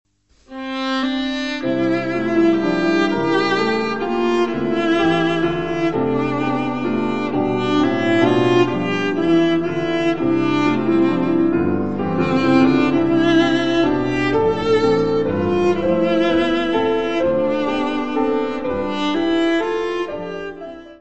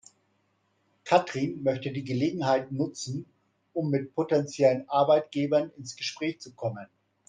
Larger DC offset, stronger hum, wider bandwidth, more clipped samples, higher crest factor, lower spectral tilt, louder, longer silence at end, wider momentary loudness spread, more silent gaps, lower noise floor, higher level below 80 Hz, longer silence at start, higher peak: first, 1% vs under 0.1%; neither; second, 8.2 kHz vs 9.8 kHz; neither; about the same, 16 dB vs 20 dB; about the same, -6.5 dB/octave vs -6 dB/octave; first, -18 LUFS vs -28 LUFS; second, 0 s vs 0.45 s; second, 6 LU vs 12 LU; neither; second, -45 dBFS vs -72 dBFS; first, -46 dBFS vs -72 dBFS; second, 0.05 s vs 1.05 s; first, -2 dBFS vs -8 dBFS